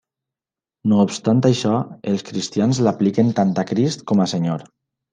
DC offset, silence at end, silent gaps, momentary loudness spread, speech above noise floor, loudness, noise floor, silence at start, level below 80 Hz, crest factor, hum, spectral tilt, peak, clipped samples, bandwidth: under 0.1%; 0.5 s; none; 7 LU; 71 dB; -19 LUFS; -89 dBFS; 0.85 s; -62 dBFS; 16 dB; none; -6.5 dB/octave; -2 dBFS; under 0.1%; 9.6 kHz